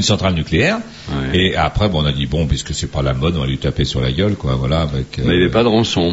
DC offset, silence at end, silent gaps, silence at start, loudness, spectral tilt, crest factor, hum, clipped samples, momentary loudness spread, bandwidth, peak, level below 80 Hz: under 0.1%; 0 s; none; 0 s; -17 LUFS; -5.5 dB/octave; 14 dB; none; under 0.1%; 6 LU; 8 kHz; -2 dBFS; -28 dBFS